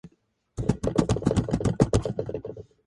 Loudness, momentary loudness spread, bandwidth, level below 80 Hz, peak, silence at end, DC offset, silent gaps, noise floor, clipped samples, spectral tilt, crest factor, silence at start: -26 LUFS; 13 LU; 11.5 kHz; -38 dBFS; -4 dBFS; 0.25 s; under 0.1%; none; -66 dBFS; under 0.1%; -7 dB/octave; 24 dB; 0.05 s